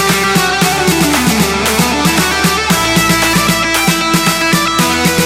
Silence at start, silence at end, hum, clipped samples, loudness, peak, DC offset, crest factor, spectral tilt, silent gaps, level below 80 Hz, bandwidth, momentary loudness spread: 0 s; 0 s; none; under 0.1%; -11 LUFS; 0 dBFS; under 0.1%; 12 dB; -3.5 dB/octave; none; -32 dBFS; 17 kHz; 2 LU